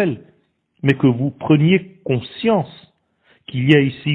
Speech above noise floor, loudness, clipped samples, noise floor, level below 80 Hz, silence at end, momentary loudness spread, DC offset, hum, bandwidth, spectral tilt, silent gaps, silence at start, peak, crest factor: 45 dB; -18 LUFS; under 0.1%; -61 dBFS; -56 dBFS; 0 s; 9 LU; under 0.1%; none; 4.5 kHz; -9 dB/octave; none; 0 s; 0 dBFS; 18 dB